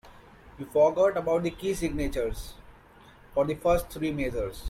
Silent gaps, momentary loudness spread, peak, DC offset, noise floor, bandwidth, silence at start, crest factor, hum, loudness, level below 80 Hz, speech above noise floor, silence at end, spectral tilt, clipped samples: none; 10 LU; -10 dBFS; under 0.1%; -53 dBFS; 16.5 kHz; 0.05 s; 18 dB; none; -27 LUFS; -42 dBFS; 27 dB; 0 s; -6 dB/octave; under 0.1%